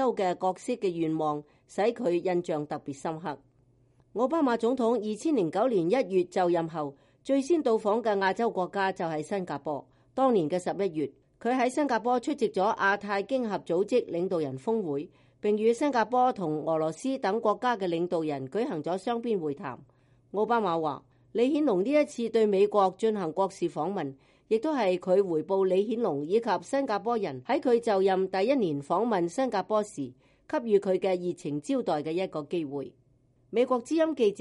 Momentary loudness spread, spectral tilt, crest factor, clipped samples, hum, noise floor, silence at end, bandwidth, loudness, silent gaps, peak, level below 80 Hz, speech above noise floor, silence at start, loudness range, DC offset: 10 LU; -6 dB/octave; 16 dB; under 0.1%; none; -65 dBFS; 0 s; 11.5 kHz; -28 LUFS; none; -12 dBFS; -72 dBFS; 37 dB; 0 s; 3 LU; under 0.1%